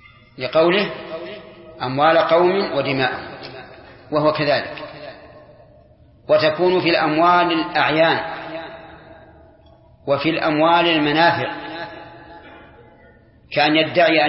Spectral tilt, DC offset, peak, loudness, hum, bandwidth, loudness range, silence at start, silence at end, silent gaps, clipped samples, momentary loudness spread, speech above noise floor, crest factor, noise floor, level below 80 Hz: -9.5 dB/octave; under 0.1%; -2 dBFS; -17 LUFS; none; 5.8 kHz; 4 LU; 0.4 s; 0 s; none; under 0.1%; 20 LU; 33 dB; 18 dB; -49 dBFS; -56 dBFS